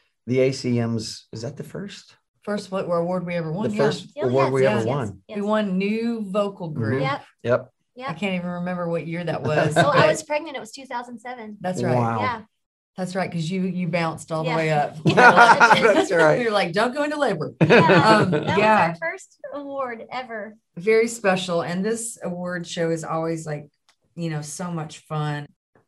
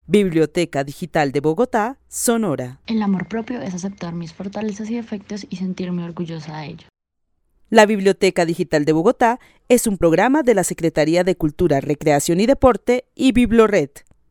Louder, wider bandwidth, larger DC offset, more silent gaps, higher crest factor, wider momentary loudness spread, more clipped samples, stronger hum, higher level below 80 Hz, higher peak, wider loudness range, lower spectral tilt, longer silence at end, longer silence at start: second, -21 LUFS vs -18 LUFS; second, 12.5 kHz vs 18.5 kHz; neither; first, 2.28-2.34 s, 12.66-12.93 s vs none; about the same, 22 dB vs 18 dB; first, 18 LU vs 14 LU; neither; neither; second, -62 dBFS vs -42 dBFS; about the same, 0 dBFS vs 0 dBFS; about the same, 10 LU vs 10 LU; about the same, -5.5 dB/octave vs -5.5 dB/octave; about the same, 0.4 s vs 0.3 s; first, 0.25 s vs 0.1 s